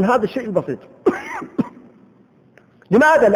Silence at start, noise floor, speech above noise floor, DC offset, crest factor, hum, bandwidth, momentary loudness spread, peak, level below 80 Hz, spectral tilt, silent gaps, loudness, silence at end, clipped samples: 0 s; -52 dBFS; 36 dB; under 0.1%; 16 dB; none; over 20 kHz; 15 LU; -2 dBFS; -56 dBFS; -6.5 dB/octave; none; -19 LUFS; 0 s; under 0.1%